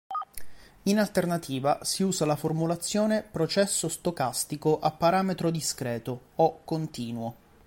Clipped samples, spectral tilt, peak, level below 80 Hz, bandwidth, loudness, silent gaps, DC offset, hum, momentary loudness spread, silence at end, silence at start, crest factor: under 0.1%; -4.5 dB/octave; -10 dBFS; -58 dBFS; 17 kHz; -28 LUFS; none; under 0.1%; none; 10 LU; 0.35 s; 0.1 s; 18 dB